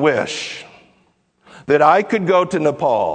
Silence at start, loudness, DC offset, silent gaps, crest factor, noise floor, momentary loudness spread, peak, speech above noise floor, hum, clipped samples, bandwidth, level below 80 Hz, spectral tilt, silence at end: 0 s; -16 LUFS; under 0.1%; none; 18 dB; -60 dBFS; 16 LU; 0 dBFS; 44 dB; none; under 0.1%; 9.4 kHz; -62 dBFS; -5 dB/octave; 0 s